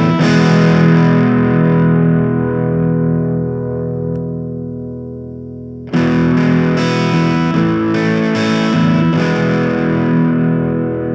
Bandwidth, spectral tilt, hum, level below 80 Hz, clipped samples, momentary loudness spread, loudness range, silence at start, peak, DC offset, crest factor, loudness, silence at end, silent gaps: 7.6 kHz; -8 dB/octave; 50 Hz at -60 dBFS; -42 dBFS; under 0.1%; 13 LU; 6 LU; 0 s; 0 dBFS; under 0.1%; 14 dB; -13 LUFS; 0 s; none